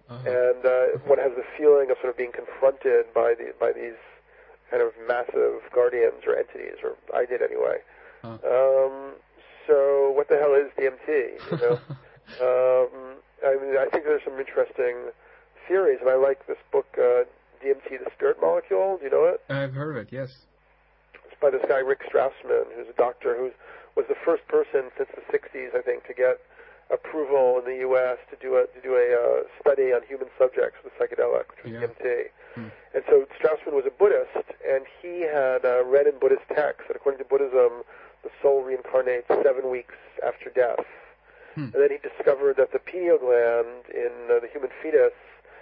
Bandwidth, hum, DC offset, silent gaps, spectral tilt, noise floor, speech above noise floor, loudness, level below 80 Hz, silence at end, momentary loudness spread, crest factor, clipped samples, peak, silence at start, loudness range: 5 kHz; none; under 0.1%; none; -10.5 dB/octave; -61 dBFS; 38 dB; -24 LUFS; -66 dBFS; 0.5 s; 12 LU; 16 dB; under 0.1%; -8 dBFS; 0.1 s; 3 LU